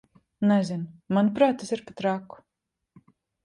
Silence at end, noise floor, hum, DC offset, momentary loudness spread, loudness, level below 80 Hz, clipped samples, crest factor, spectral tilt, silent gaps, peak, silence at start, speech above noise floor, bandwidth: 1.2 s; -84 dBFS; none; under 0.1%; 11 LU; -26 LUFS; -68 dBFS; under 0.1%; 18 dB; -7 dB/octave; none; -8 dBFS; 0.4 s; 59 dB; 10.5 kHz